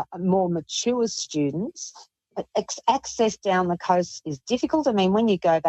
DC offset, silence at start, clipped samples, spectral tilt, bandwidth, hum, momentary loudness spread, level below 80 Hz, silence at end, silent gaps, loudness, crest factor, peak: under 0.1%; 0 s; under 0.1%; -5 dB/octave; 8.4 kHz; none; 12 LU; -62 dBFS; 0 s; none; -24 LUFS; 16 dB; -6 dBFS